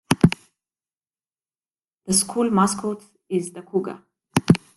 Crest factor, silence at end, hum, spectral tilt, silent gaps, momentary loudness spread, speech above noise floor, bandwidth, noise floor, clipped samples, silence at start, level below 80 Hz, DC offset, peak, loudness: 24 dB; 0.2 s; none; -5 dB/octave; 0.97-1.01 s; 15 LU; over 67 dB; 12.5 kHz; under -90 dBFS; under 0.1%; 0.1 s; -52 dBFS; under 0.1%; 0 dBFS; -22 LUFS